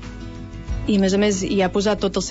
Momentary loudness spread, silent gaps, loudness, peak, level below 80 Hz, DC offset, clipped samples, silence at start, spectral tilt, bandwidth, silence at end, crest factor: 17 LU; none; -20 LUFS; -8 dBFS; -34 dBFS; under 0.1%; under 0.1%; 0 s; -5 dB/octave; 8 kHz; 0 s; 14 dB